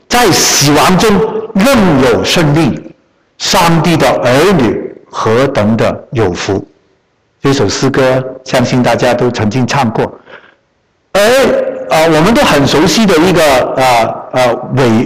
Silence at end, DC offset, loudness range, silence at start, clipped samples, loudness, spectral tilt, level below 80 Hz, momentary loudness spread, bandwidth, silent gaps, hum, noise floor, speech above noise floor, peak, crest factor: 0 s; under 0.1%; 4 LU; 0.1 s; under 0.1%; -9 LUFS; -4.5 dB/octave; -34 dBFS; 7 LU; 16.5 kHz; none; none; -57 dBFS; 48 dB; -2 dBFS; 8 dB